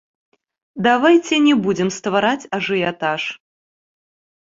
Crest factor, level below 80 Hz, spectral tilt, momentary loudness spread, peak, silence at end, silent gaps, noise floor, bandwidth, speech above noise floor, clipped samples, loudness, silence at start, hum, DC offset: 18 dB; -60 dBFS; -4.5 dB/octave; 11 LU; -2 dBFS; 1.05 s; none; under -90 dBFS; 7.8 kHz; over 73 dB; under 0.1%; -17 LUFS; 0.75 s; none; under 0.1%